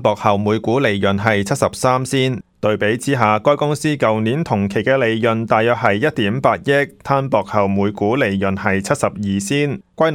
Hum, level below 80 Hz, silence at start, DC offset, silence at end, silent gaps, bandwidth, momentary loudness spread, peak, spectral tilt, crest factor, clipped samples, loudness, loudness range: none; -52 dBFS; 0 s; under 0.1%; 0 s; none; 16.5 kHz; 3 LU; 0 dBFS; -5.5 dB/octave; 16 dB; under 0.1%; -17 LUFS; 1 LU